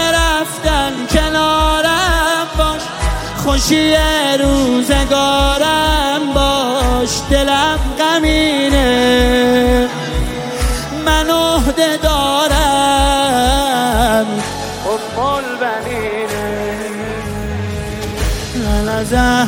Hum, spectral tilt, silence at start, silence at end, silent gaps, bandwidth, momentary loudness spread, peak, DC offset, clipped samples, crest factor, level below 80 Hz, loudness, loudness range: none; -4 dB/octave; 0 s; 0 s; none; 17 kHz; 8 LU; 0 dBFS; under 0.1%; under 0.1%; 14 dB; -22 dBFS; -14 LUFS; 7 LU